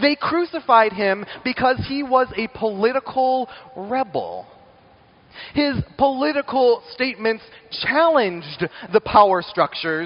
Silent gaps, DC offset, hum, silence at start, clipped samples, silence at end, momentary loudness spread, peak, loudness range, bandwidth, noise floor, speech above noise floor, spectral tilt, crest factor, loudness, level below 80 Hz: none; under 0.1%; none; 0 s; under 0.1%; 0 s; 12 LU; 0 dBFS; 5 LU; 5.6 kHz; -52 dBFS; 32 dB; -3 dB/octave; 20 dB; -20 LUFS; -50 dBFS